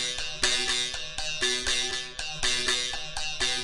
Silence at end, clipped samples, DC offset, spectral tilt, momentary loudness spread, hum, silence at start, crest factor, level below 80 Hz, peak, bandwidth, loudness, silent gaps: 0 s; under 0.1%; under 0.1%; 0 dB/octave; 7 LU; none; 0 s; 20 dB; -46 dBFS; -10 dBFS; 11.5 kHz; -27 LUFS; none